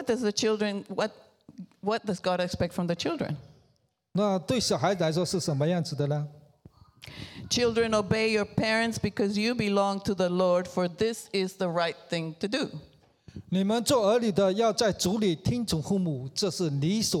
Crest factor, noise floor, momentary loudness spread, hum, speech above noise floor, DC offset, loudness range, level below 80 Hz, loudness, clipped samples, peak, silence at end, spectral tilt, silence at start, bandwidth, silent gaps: 18 dB; -70 dBFS; 9 LU; none; 43 dB; under 0.1%; 4 LU; -56 dBFS; -28 LUFS; under 0.1%; -10 dBFS; 0 s; -5 dB/octave; 0 s; 17 kHz; none